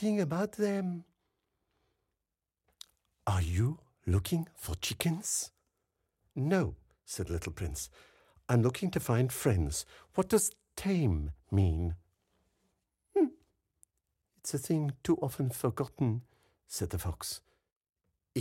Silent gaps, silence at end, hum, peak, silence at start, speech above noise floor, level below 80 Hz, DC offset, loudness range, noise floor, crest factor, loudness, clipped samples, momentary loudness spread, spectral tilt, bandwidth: 17.72-17.81 s; 0 s; none; -12 dBFS; 0 s; 57 dB; -52 dBFS; under 0.1%; 6 LU; -89 dBFS; 22 dB; -33 LUFS; under 0.1%; 11 LU; -5.5 dB/octave; 16.5 kHz